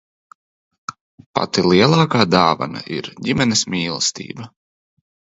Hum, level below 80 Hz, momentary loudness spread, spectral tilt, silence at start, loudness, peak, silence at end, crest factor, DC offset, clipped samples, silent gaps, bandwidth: none; -50 dBFS; 21 LU; -4.5 dB/octave; 0.9 s; -17 LUFS; 0 dBFS; 0.95 s; 20 dB; under 0.1%; under 0.1%; 1.01-1.18 s, 1.26-1.34 s; 8 kHz